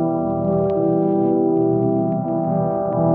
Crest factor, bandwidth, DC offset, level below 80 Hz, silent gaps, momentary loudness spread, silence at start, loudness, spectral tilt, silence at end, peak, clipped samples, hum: 10 dB; 2.7 kHz; under 0.1%; -52 dBFS; none; 3 LU; 0 s; -19 LUFS; -12 dB/octave; 0 s; -8 dBFS; under 0.1%; none